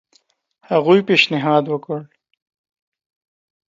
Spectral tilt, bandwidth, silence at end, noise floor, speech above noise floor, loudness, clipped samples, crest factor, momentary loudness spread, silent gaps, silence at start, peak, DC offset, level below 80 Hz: -6 dB/octave; 7.6 kHz; 1.65 s; -61 dBFS; 44 dB; -16 LUFS; under 0.1%; 20 dB; 14 LU; none; 0.7 s; 0 dBFS; under 0.1%; -70 dBFS